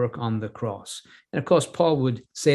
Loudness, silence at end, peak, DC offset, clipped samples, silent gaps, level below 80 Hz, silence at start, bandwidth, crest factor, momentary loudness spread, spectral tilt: -25 LUFS; 0 s; -4 dBFS; under 0.1%; under 0.1%; none; -60 dBFS; 0 s; 12.5 kHz; 20 dB; 14 LU; -5.5 dB/octave